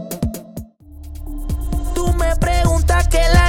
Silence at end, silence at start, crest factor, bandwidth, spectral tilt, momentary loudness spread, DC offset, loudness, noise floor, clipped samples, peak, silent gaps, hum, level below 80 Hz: 0 s; 0 s; 14 dB; 17 kHz; -5.5 dB/octave; 19 LU; under 0.1%; -19 LUFS; -36 dBFS; under 0.1%; -2 dBFS; none; none; -18 dBFS